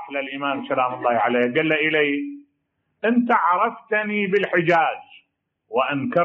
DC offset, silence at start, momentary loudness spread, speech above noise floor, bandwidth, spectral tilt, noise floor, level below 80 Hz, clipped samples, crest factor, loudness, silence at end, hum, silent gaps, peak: under 0.1%; 0 s; 8 LU; 53 dB; 7.2 kHz; -3 dB/octave; -73 dBFS; -72 dBFS; under 0.1%; 16 dB; -21 LUFS; 0 s; none; none; -6 dBFS